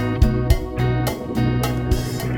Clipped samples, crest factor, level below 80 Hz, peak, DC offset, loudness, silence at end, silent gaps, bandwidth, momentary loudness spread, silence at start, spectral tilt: under 0.1%; 16 dB; -24 dBFS; -4 dBFS; under 0.1%; -21 LUFS; 0 s; none; 17.5 kHz; 3 LU; 0 s; -6.5 dB/octave